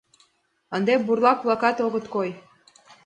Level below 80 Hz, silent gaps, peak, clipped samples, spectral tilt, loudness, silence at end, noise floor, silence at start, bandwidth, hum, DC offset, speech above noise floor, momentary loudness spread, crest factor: -72 dBFS; none; -4 dBFS; under 0.1%; -6 dB/octave; -23 LUFS; 0.65 s; -66 dBFS; 0.7 s; 9.4 kHz; none; under 0.1%; 44 dB; 12 LU; 20 dB